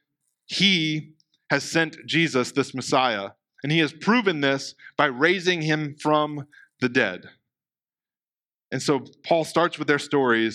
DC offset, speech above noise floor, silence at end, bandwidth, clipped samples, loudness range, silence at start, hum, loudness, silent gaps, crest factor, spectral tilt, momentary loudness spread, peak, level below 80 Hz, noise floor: under 0.1%; over 67 dB; 0 s; 13.5 kHz; under 0.1%; 5 LU; 0.5 s; none; -23 LUFS; none; 20 dB; -4.5 dB/octave; 10 LU; -4 dBFS; -76 dBFS; under -90 dBFS